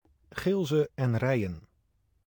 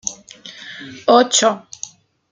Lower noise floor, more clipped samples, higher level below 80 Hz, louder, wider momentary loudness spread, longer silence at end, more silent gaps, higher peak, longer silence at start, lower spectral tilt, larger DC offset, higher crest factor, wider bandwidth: first, -71 dBFS vs -39 dBFS; neither; first, -58 dBFS vs -66 dBFS; second, -29 LUFS vs -15 LUFS; second, 13 LU vs 22 LU; about the same, 0.7 s vs 0.75 s; neither; second, -16 dBFS vs 0 dBFS; first, 0.35 s vs 0.05 s; first, -7.5 dB/octave vs -1.5 dB/octave; neither; about the same, 14 dB vs 18 dB; first, 19.5 kHz vs 10 kHz